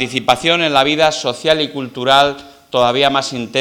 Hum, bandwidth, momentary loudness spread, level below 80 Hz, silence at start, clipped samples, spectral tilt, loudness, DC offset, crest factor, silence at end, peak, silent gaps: none; 19 kHz; 8 LU; -50 dBFS; 0 s; under 0.1%; -3.5 dB/octave; -14 LUFS; under 0.1%; 16 dB; 0 s; 0 dBFS; none